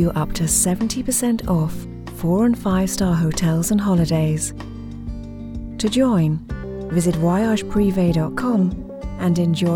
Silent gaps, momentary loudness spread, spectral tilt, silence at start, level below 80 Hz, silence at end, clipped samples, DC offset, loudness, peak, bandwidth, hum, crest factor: none; 15 LU; -5.5 dB/octave; 0 s; -36 dBFS; 0 s; under 0.1%; under 0.1%; -19 LUFS; -6 dBFS; 18.5 kHz; none; 14 dB